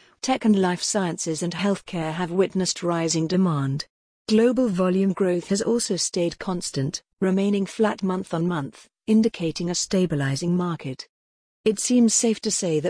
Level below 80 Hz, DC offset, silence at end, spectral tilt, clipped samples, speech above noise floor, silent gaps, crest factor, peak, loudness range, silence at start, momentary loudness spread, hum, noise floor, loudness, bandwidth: -58 dBFS; under 0.1%; 0 s; -5 dB/octave; under 0.1%; over 67 dB; 3.90-4.25 s, 11.09-11.64 s; 14 dB; -8 dBFS; 2 LU; 0.25 s; 9 LU; none; under -90 dBFS; -23 LUFS; 10.5 kHz